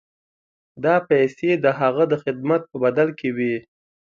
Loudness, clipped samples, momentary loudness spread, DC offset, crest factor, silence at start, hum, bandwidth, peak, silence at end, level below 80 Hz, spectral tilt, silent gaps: -21 LUFS; under 0.1%; 6 LU; under 0.1%; 18 dB; 0.75 s; none; 7.2 kHz; -4 dBFS; 0.45 s; -66 dBFS; -8 dB/octave; none